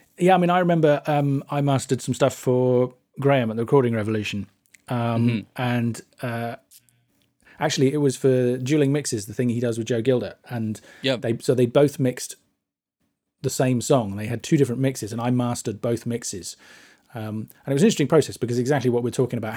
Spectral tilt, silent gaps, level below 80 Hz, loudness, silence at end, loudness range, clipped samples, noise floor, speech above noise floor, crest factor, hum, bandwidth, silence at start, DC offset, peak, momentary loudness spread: -6 dB/octave; none; -66 dBFS; -23 LUFS; 0 s; 4 LU; under 0.1%; -80 dBFS; 58 dB; 18 dB; none; 17 kHz; 0.2 s; under 0.1%; -4 dBFS; 12 LU